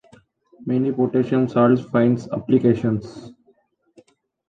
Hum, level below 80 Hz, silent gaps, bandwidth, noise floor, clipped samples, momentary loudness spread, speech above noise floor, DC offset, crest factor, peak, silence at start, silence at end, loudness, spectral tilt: none; -56 dBFS; none; 7.4 kHz; -61 dBFS; under 0.1%; 12 LU; 42 dB; under 0.1%; 16 dB; -4 dBFS; 0.6 s; 1.15 s; -20 LUFS; -9 dB/octave